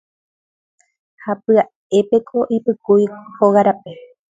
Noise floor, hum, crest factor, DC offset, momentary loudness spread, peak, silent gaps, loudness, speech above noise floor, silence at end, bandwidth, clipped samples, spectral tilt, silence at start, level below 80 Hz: under -90 dBFS; none; 18 dB; under 0.1%; 12 LU; 0 dBFS; 1.75-1.90 s; -17 LUFS; over 74 dB; 0.35 s; 7.8 kHz; under 0.1%; -7.5 dB/octave; 1.25 s; -66 dBFS